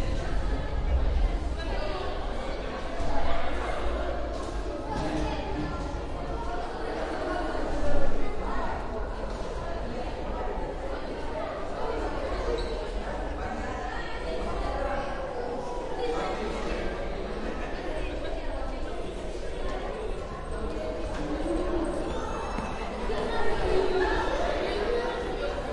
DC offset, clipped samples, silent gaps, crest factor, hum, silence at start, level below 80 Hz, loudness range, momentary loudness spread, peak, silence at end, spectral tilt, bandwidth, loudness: under 0.1%; under 0.1%; none; 18 dB; none; 0 s; -34 dBFS; 5 LU; 6 LU; -10 dBFS; 0 s; -6 dB/octave; 10.5 kHz; -32 LUFS